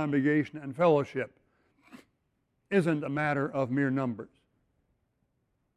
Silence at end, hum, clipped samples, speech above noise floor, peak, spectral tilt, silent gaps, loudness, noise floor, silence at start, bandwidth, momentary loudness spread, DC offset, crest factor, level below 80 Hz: 1.5 s; none; under 0.1%; 48 dB; -12 dBFS; -8 dB/octave; none; -29 LUFS; -77 dBFS; 0 s; 11 kHz; 12 LU; under 0.1%; 18 dB; -70 dBFS